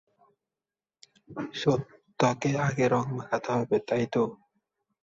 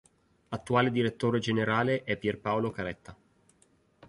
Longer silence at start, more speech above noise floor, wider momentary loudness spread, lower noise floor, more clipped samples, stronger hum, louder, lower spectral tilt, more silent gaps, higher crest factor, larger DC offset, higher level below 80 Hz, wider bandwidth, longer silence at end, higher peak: first, 1.3 s vs 0.5 s; first, over 63 dB vs 37 dB; about the same, 10 LU vs 12 LU; first, under -90 dBFS vs -67 dBFS; neither; neither; about the same, -28 LUFS vs -29 LUFS; about the same, -6 dB/octave vs -6.5 dB/octave; neither; about the same, 22 dB vs 20 dB; neither; about the same, -64 dBFS vs -60 dBFS; second, 7.8 kHz vs 11.5 kHz; second, 0.65 s vs 0.95 s; first, -8 dBFS vs -12 dBFS